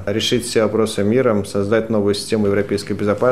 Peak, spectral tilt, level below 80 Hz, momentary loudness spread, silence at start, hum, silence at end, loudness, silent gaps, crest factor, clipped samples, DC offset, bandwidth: -4 dBFS; -5 dB/octave; -50 dBFS; 4 LU; 0 s; none; 0 s; -18 LUFS; none; 14 dB; under 0.1%; 0.9%; 14.5 kHz